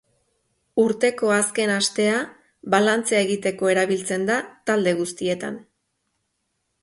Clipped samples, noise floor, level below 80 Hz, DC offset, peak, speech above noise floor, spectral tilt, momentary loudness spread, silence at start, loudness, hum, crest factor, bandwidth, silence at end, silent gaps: under 0.1%; -74 dBFS; -66 dBFS; under 0.1%; -4 dBFS; 53 dB; -3.5 dB/octave; 8 LU; 0.75 s; -21 LUFS; none; 18 dB; 11.5 kHz; 1.2 s; none